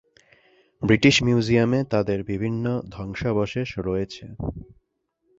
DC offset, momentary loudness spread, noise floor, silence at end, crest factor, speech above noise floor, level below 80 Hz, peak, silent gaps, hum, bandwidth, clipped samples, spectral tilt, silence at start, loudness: under 0.1%; 16 LU; -74 dBFS; 0.75 s; 22 dB; 51 dB; -46 dBFS; -2 dBFS; none; none; 8 kHz; under 0.1%; -5.5 dB/octave; 0.8 s; -23 LUFS